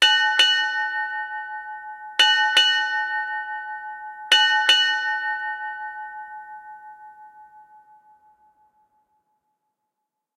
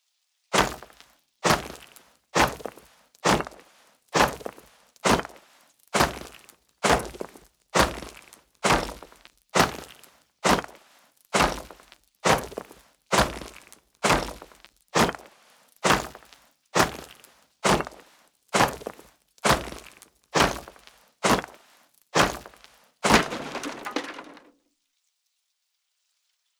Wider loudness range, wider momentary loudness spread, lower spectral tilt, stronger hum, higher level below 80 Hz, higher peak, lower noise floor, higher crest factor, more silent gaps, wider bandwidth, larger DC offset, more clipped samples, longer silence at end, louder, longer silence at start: first, 17 LU vs 2 LU; about the same, 20 LU vs 18 LU; second, 3.5 dB/octave vs -3 dB/octave; neither; second, -78 dBFS vs -46 dBFS; about the same, -4 dBFS vs -4 dBFS; first, -82 dBFS vs -77 dBFS; about the same, 20 dB vs 24 dB; neither; second, 16 kHz vs over 20 kHz; neither; neither; first, 2.75 s vs 2.25 s; first, -19 LUFS vs -25 LUFS; second, 0 s vs 0.5 s